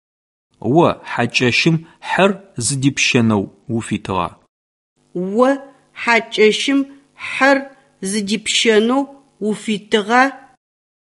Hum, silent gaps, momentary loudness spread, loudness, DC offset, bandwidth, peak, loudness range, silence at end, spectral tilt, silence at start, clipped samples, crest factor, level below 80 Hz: none; 4.49-4.96 s; 12 LU; -17 LUFS; under 0.1%; 11.5 kHz; 0 dBFS; 3 LU; 0.7 s; -4 dB/octave; 0.65 s; under 0.1%; 18 dB; -52 dBFS